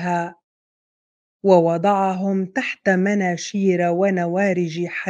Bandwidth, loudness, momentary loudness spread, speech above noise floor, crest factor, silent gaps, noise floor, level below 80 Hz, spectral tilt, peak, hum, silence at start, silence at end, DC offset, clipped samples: 7.8 kHz; -20 LUFS; 8 LU; over 71 dB; 20 dB; 0.44-1.40 s; under -90 dBFS; -72 dBFS; -6.5 dB/octave; -2 dBFS; none; 0 s; 0 s; under 0.1%; under 0.1%